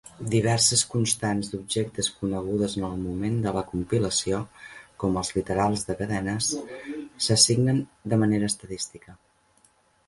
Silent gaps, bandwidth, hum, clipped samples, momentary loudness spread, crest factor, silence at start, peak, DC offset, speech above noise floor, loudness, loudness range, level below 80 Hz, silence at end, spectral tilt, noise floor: none; 12 kHz; none; under 0.1%; 14 LU; 22 dB; 0.05 s; -4 dBFS; under 0.1%; 37 dB; -25 LUFS; 4 LU; -50 dBFS; 0.9 s; -4 dB/octave; -63 dBFS